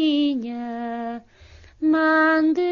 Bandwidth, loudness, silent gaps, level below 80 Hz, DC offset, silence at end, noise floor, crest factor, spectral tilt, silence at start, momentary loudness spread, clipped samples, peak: 6.4 kHz; -21 LUFS; none; -56 dBFS; under 0.1%; 0 s; -48 dBFS; 14 dB; -5.5 dB/octave; 0 s; 14 LU; under 0.1%; -6 dBFS